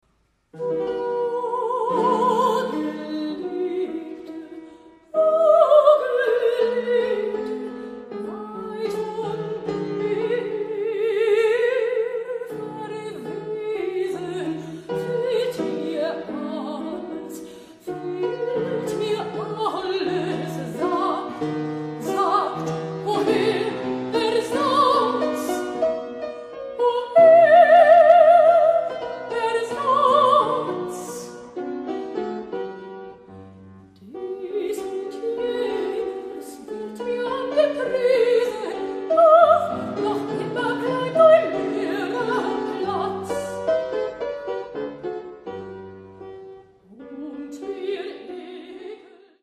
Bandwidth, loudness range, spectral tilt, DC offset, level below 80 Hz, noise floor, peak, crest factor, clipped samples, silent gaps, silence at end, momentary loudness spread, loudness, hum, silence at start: 13.5 kHz; 15 LU; -5.5 dB/octave; under 0.1%; -64 dBFS; -66 dBFS; -2 dBFS; 20 dB; under 0.1%; none; 0.45 s; 20 LU; -21 LUFS; none; 0.55 s